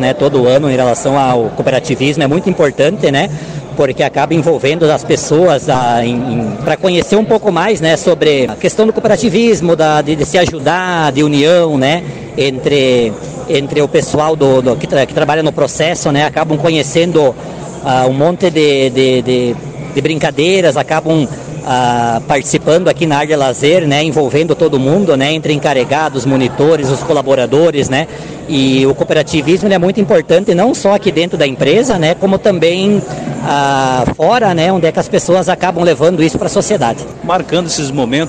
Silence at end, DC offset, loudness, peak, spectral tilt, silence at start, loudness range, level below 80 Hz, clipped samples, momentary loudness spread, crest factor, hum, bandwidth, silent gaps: 0 s; 0.2%; -11 LUFS; -2 dBFS; -5 dB/octave; 0 s; 2 LU; -40 dBFS; under 0.1%; 5 LU; 10 dB; none; 9.6 kHz; none